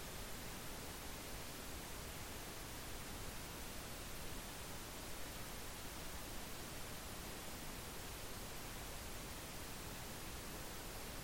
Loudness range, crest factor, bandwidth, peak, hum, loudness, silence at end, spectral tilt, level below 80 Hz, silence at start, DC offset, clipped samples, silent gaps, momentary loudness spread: 0 LU; 12 dB; 16.5 kHz; -36 dBFS; none; -49 LUFS; 0 s; -3 dB/octave; -56 dBFS; 0 s; under 0.1%; under 0.1%; none; 0 LU